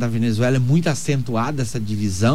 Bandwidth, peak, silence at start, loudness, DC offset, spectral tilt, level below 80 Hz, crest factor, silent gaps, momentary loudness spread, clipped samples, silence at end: 15 kHz; -6 dBFS; 0 s; -20 LUFS; 3%; -6 dB/octave; -46 dBFS; 12 dB; none; 6 LU; under 0.1%; 0 s